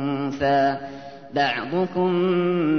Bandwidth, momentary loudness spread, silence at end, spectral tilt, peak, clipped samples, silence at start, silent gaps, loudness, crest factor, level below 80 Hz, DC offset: 6.4 kHz; 11 LU; 0 s; -7.5 dB/octave; -8 dBFS; under 0.1%; 0 s; none; -22 LUFS; 14 dB; -56 dBFS; 0.3%